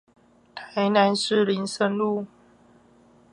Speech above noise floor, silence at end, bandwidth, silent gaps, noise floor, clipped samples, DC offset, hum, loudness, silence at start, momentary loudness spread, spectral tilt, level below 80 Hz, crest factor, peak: 34 dB; 1.05 s; 11.5 kHz; none; -56 dBFS; under 0.1%; under 0.1%; none; -23 LUFS; 0.55 s; 21 LU; -5 dB/octave; -72 dBFS; 20 dB; -6 dBFS